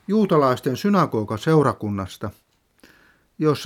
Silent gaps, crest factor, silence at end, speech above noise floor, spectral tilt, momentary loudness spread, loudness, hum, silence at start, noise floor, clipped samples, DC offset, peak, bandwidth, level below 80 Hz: none; 18 dB; 0 s; 36 dB; -7 dB/octave; 12 LU; -21 LUFS; none; 0.1 s; -56 dBFS; under 0.1%; under 0.1%; -4 dBFS; 16 kHz; -58 dBFS